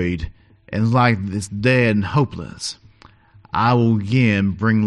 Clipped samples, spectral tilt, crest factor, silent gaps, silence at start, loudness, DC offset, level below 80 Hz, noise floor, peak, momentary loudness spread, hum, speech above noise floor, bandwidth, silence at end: under 0.1%; -6.5 dB/octave; 16 dB; none; 0 s; -19 LUFS; under 0.1%; -42 dBFS; -49 dBFS; -2 dBFS; 13 LU; none; 31 dB; 11.5 kHz; 0 s